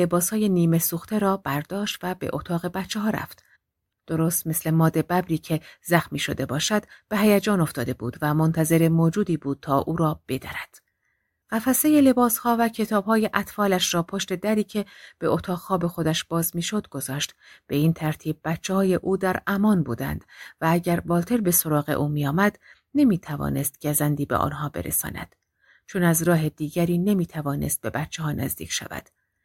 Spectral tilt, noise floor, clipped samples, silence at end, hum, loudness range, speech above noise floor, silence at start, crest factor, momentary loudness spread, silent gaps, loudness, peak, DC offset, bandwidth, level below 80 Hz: -5 dB/octave; -80 dBFS; under 0.1%; 0.45 s; none; 4 LU; 57 dB; 0 s; 22 dB; 9 LU; none; -24 LUFS; -2 dBFS; under 0.1%; 17 kHz; -52 dBFS